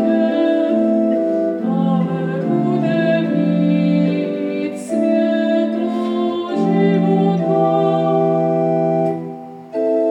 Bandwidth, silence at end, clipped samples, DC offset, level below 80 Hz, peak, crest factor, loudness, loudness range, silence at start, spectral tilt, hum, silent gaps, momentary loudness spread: 10.5 kHz; 0 s; under 0.1%; under 0.1%; -78 dBFS; -4 dBFS; 12 dB; -17 LUFS; 1 LU; 0 s; -8.5 dB/octave; none; none; 6 LU